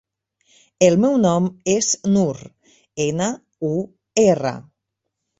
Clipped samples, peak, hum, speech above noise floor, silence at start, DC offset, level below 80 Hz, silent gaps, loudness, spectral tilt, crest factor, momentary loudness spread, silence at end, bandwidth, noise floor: under 0.1%; -2 dBFS; none; 61 dB; 0.8 s; under 0.1%; -58 dBFS; none; -19 LUFS; -5 dB/octave; 18 dB; 11 LU; 0.75 s; 8 kHz; -79 dBFS